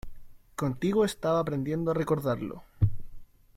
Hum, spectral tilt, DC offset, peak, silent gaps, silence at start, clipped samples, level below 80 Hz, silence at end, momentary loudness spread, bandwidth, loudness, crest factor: none; -7 dB/octave; under 0.1%; -12 dBFS; none; 0.05 s; under 0.1%; -46 dBFS; 0.3 s; 9 LU; 16.5 kHz; -29 LUFS; 16 dB